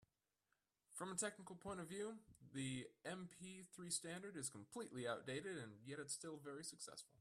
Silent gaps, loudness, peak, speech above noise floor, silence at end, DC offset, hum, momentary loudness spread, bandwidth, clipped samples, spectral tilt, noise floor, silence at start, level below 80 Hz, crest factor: none; -50 LUFS; -30 dBFS; 38 dB; 0.05 s; under 0.1%; none; 10 LU; 14.5 kHz; under 0.1%; -3.5 dB/octave; -89 dBFS; 0.9 s; -82 dBFS; 22 dB